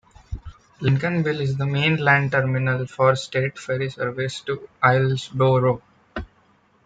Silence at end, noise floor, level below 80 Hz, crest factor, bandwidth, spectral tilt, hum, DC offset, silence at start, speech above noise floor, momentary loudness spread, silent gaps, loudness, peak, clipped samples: 0.6 s; -59 dBFS; -46 dBFS; 20 dB; 9 kHz; -6.5 dB/octave; none; under 0.1%; 0.3 s; 38 dB; 18 LU; none; -21 LUFS; -2 dBFS; under 0.1%